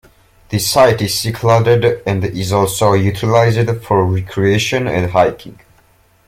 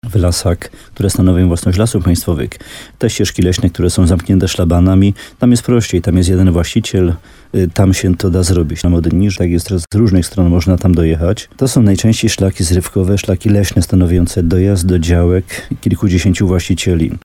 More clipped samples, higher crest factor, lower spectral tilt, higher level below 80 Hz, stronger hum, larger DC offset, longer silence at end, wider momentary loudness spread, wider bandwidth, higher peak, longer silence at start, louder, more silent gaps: neither; about the same, 14 dB vs 12 dB; about the same, -5 dB/octave vs -6 dB/octave; second, -42 dBFS vs -26 dBFS; neither; neither; first, 0.75 s vs 0.05 s; about the same, 7 LU vs 6 LU; about the same, 16.5 kHz vs 16 kHz; about the same, 0 dBFS vs 0 dBFS; first, 0.5 s vs 0.05 s; about the same, -14 LUFS vs -13 LUFS; neither